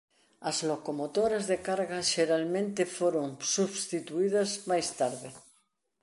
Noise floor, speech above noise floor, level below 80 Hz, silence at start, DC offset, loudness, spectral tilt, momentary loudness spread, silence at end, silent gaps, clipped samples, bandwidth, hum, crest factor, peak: -72 dBFS; 42 dB; -70 dBFS; 0.4 s; under 0.1%; -30 LUFS; -3.5 dB/octave; 6 LU; 0.6 s; none; under 0.1%; 11.5 kHz; none; 18 dB; -14 dBFS